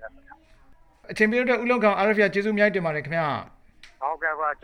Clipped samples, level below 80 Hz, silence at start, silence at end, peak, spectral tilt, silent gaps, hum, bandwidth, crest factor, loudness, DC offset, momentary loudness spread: under 0.1%; -58 dBFS; 0 s; 0.1 s; -6 dBFS; -6.5 dB/octave; none; none; 10.5 kHz; 18 dB; -23 LUFS; under 0.1%; 12 LU